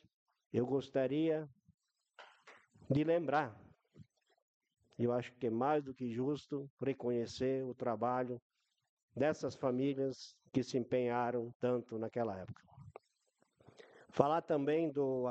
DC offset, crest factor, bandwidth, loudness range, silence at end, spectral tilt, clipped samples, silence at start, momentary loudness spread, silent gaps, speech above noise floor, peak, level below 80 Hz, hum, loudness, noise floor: under 0.1%; 26 dB; 8.4 kHz; 3 LU; 0 s; -7 dB/octave; under 0.1%; 0.55 s; 11 LU; 1.74-1.78 s, 4.42-4.60 s, 6.70-6.77 s, 8.42-8.50 s, 8.89-8.97 s, 9.03-9.08 s, 11.55-11.60 s; 43 dB; -12 dBFS; -78 dBFS; none; -37 LUFS; -79 dBFS